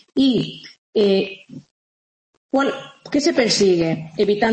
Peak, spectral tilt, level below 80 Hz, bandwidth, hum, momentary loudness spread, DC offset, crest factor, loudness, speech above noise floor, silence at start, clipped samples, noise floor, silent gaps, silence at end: -4 dBFS; -4.5 dB/octave; -56 dBFS; 8.8 kHz; none; 13 LU; under 0.1%; 16 dB; -19 LUFS; over 72 dB; 0.15 s; under 0.1%; under -90 dBFS; 0.78-0.93 s, 1.71-2.49 s; 0 s